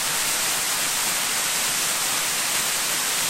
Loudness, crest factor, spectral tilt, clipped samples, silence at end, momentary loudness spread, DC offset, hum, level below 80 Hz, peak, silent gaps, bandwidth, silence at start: -21 LUFS; 14 dB; 1 dB/octave; under 0.1%; 0 s; 0 LU; under 0.1%; none; -56 dBFS; -10 dBFS; none; 16 kHz; 0 s